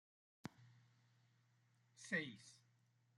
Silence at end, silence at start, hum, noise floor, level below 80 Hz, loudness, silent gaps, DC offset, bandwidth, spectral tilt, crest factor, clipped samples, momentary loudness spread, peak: 0.6 s; 0.45 s; none; -78 dBFS; under -90 dBFS; -48 LUFS; none; under 0.1%; 11.5 kHz; -4 dB/octave; 26 dB; under 0.1%; 17 LU; -28 dBFS